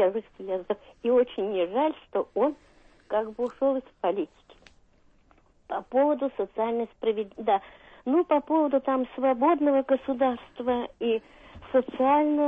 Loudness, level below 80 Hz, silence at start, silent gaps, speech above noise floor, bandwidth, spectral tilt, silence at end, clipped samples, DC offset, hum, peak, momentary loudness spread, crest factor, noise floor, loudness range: -27 LUFS; -62 dBFS; 0 s; none; 35 dB; 3.9 kHz; -7.5 dB/octave; 0 s; under 0.1%; under 0.1%; none; -12 dBFS; 9 LU; 16 dB; -61 dBFS; 5 LU